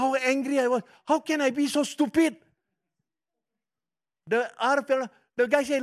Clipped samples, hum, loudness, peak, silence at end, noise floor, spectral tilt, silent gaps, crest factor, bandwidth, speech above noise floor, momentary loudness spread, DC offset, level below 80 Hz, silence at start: under 0.1%; none; -26 LUFS; -8 dBFS; 0 s; under -90 dBFS; -3.5 dB/octave; none; 18 dB; 14.5 kHz; over 65 dB; 5 LU; under 0.1%; -72 dBFS; 0 s